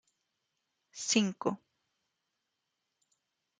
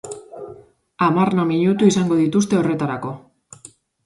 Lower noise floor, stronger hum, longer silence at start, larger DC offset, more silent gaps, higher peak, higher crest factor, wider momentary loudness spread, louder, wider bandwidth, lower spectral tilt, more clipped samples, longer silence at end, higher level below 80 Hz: first, -85 dBFS vs -47 dBFS; neither; first, 0.95 s vs 0.05 s; neither; neither; second, -12 dBFS vs -2 dBFS; first, 26 dB vs 18 dB; second, 18 LU vs 21 LU; second, -32 LUFS vs -18 LUFS; second, 9.6 kHz vs 11.5 kHz; second, -3 dB/octave vs -6.5 dB/octave; neither; first, 2.05 s vs 0.85 s; second, -84 dBFS vs -58 dBFS